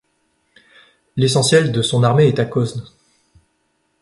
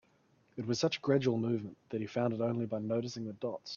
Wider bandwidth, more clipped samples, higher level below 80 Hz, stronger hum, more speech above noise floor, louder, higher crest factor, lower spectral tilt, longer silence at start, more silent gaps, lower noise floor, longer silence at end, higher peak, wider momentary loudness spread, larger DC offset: first, 11.5 kHz vs 7.4 kHz; neither; first, -54 dBFS vs -74 dBFS; neither; first, 51 dB vs 36 dB; first, -16 LUFS vs -35 LUFS; about the same, 18 dB vs 18 dB; about the same, -5 dB/octave vs -6 dB/octave; first, 1.15 s vs 0.55 s; neither; second, -66 dBFS vs -70 dBFS; first, 1.15 s vs 0 s; first, -2 dBFS vs -16 dBFS; about the same, 11 LU vs 11 LU; neither